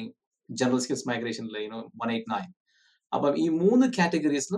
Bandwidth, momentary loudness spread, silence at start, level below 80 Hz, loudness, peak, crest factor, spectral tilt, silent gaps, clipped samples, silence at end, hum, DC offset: 12 kHz; 14 LU; 0 s; -74 dBFS; -27 LUFS; -10 dBFS; 16 dB; -5 dB/octave; 0.27-0.31 s, 2.60-2.65 s; under 0.1%; 0 s; none; under 0.1%